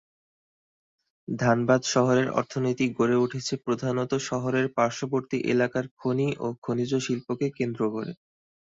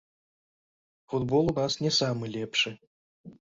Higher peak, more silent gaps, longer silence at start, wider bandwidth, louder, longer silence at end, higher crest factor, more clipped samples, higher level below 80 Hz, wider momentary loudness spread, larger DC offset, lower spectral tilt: first, -8 dBFS vs -14 dBFS; second, 5.91-5.97 s, 6.58-6.62 s vs 2.87-3.24 s; first, 1.3 s vs 1.1 s; about the same, 7.8 kHz vs 7.8 kHz; about the same, -26 LUFS vs -28 LUFS; first, 0.5 s vs 0.1 s; about the same, 20 dB vs 18 dB; neither; second, -64 dBFS vs -58 dBFS; about the same, 8 LU vs 7 LU; neither; about the same, -5.5 dB/octave vs -4.5 dB/octave